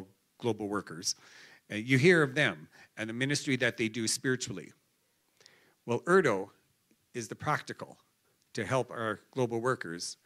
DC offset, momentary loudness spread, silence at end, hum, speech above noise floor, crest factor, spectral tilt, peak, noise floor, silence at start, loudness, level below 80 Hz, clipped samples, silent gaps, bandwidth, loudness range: under 0.1%; 18 LU; 0.1 s; none; 43 dB; 22 dB; -4.5 dB/octave; -12 dBFS; -74 dBFS; 0 s; -31 LUFS; -78 dBFS; under 0.1%; none; 14.5 kHz; 6 LU